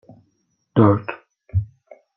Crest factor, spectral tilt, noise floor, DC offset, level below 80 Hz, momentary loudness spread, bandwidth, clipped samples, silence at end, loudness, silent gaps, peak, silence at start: 20 dB; -11 dB/octave; -68 dBFS; under 0.1%; -46 dBFS; 21 LU; 3.8 kHz; under 0.1%; 0.5 s; -20 LUFS; none; -2 dBFS; 0.75 s